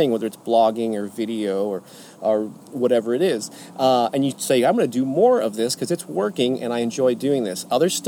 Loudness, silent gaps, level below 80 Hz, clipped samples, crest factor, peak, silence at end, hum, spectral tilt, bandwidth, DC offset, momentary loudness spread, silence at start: -21 LUFS; none; -74 dBFS; under 0.1%; 14 dB; -6 dBFS; 0 s; none; -4.5 dB/octave; 18 kHz; under 0.1%; 8 LU; 0 s